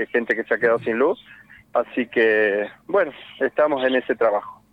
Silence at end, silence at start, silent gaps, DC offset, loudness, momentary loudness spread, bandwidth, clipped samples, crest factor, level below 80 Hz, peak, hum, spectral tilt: 0.2 s; 0 s; none; under 0.1%; -21 LUFS; 8 LU; 5.2 kHz; under 0.1%; 14 dB; -64 dBFS; -6 dBFS; none; -6.5 dB/octave